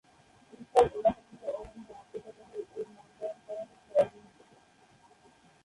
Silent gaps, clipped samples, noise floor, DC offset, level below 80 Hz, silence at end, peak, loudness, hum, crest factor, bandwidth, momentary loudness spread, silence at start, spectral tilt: none; under 0.1%; -62 dBFS; under 0.1%; -62 dBFS; 1.55 s; -10 dBFS; -32 LUFS; none; 24 dB; 11.5 kHz; 20 LU; 0.6 s; -5.5 dB/octave